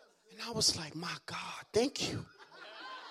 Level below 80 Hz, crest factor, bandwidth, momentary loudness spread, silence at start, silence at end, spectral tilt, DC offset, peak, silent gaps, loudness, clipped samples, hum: -68 dBFS; 22 dB; 15.5 kHz; 19 LU; 0 s; 0 s; -2.5 dB/octave; under 0.1%; -16 dBFS; none; -35 LUFS; under 0.1%; none